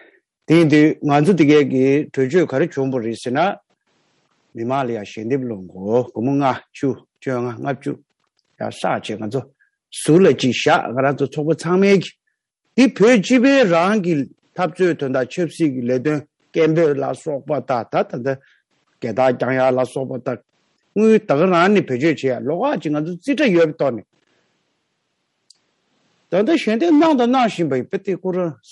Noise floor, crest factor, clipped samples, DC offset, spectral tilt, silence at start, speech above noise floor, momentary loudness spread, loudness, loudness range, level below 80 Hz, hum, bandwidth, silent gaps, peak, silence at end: -72 dBFS; 16 dB; under 0.1%; under 0.1%; -6.5 dB/octave; 0.5 s; 55 dB; 13 LU; -18 LUFS; 7 LU; -68 dBFS; none; 11.5 kHz; none; -2 dBFS; 0.15 s